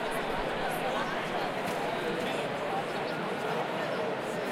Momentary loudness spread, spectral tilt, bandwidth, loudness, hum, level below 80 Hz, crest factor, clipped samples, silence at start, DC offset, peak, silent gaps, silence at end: 2 LU; -4.5 dB/octave; 16 kHz; -32 LUFS; none; -56 dBFS; 12 dB; under 0.1%; 0 s; under 0.1%; -20 dBFS; none; 0 s